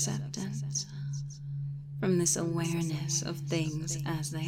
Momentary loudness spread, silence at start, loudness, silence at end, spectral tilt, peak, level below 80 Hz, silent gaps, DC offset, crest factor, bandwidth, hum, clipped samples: 10 LU; 0 s; -32 LUFS; 0 s; -4.5 dB/octave; -14 dBFS; -60 dBFS; none; under 0.1%; 18 dB; 16 kHz; none; under 0.1%